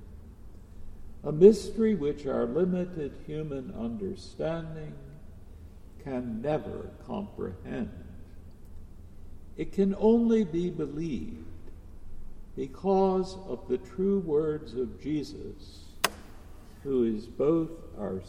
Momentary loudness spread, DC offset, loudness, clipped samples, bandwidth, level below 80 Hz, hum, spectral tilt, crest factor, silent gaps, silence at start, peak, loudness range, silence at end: 24 LU; under 0.1%; -29 LUFS; under 0.1%; 16 kHz; -46 dBFS; none; -6.5 dB/octave; 24 dB; none; 0 s; -6 dBFS; 10 LU; 0 s